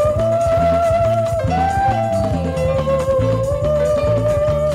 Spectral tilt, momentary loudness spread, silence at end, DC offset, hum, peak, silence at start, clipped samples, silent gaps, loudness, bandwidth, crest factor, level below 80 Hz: -7 dB/octave; 3 LU; 0 s; under 0.1%; none; -6 dBFS; 0 s; under 0.1%; none; -17 LUFS; 14.5 kHz; 10 dB; -30 dBFS